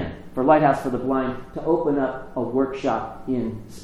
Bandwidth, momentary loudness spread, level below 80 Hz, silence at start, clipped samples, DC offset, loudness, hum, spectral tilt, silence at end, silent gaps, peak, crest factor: 13 kHz; 12 LU; -46 dBFS; 0 s; under 0.1%; under 0.1%; -23 LUFS; none; -7.5 dB/octave; 0 s; none; -4 dBFS; 18 dB